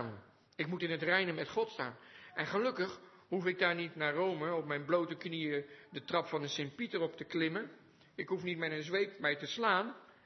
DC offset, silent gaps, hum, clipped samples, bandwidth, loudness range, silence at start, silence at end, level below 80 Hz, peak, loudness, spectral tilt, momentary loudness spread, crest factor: under 0.1%; none; none; under 0.1%; 6.2 kHz; 3 LU; 0 s; 0.15 s; -84 dBFS; -16 dBFS; -36 LUFS; -3 dB/octave; 13 LU; 22 dB